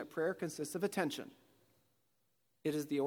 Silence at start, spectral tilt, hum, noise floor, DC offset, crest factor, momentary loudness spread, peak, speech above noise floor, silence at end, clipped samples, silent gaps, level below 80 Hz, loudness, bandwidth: 0 s; -5 dB/octave; none; -82 dBFS; under 0.1%; 20 dB; 8 LU; -20 dBFS; 44 dB; 0 s; under 0.1%; none; -88 dBFS; -39 LUFS; 19.5 kHz